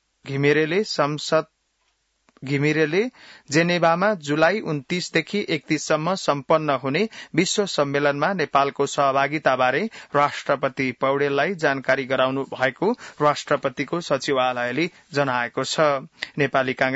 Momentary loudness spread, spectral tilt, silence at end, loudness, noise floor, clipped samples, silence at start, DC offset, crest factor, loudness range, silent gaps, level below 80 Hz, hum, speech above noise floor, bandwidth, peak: 5 LU; -4.5 dB/octave; 0 s; -22 LUFS; -70 dBFS; under 0.1%; 0.25 s; under 0.1%; 18 dB; 2 LU; none; -66 dBFS; none; 48 dB; 8 kHz; -6 dBFS